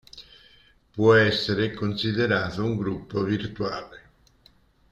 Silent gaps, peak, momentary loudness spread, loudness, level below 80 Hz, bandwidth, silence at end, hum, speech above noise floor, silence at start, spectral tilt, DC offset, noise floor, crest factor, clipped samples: none; -6 dBFS; 20 LU; -24 LUFS; -54 dBFS; 8 kHz; 0.95 s; none; 35 dB; 0.15 s; -6.5 dB/octave; under 0.1%; -59 dBFS; 20 dB; under 0.1%